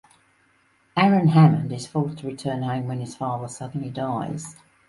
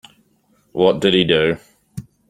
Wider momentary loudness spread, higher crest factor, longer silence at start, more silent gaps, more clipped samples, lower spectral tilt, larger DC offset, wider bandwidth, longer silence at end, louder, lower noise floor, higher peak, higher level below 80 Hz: second, 15 LU vs 22 LU; about the same, 20 dB vs 18 dB; first, 0.95 s vs 0.75 s; neither; neither; about the same, -7 dB/octave vs -6 dB/octave; neither; second, 11.5 kHz vs 14.5 kHz; about the same, 0.35 s vs 0.3 s; second, -23 LUFS vs -16 LUFS; about the same, -62 dBFS vs -60 dBFS; second, -4 dBFS vs 0 dBFS; second, -62 dBFS vs -52 dBFS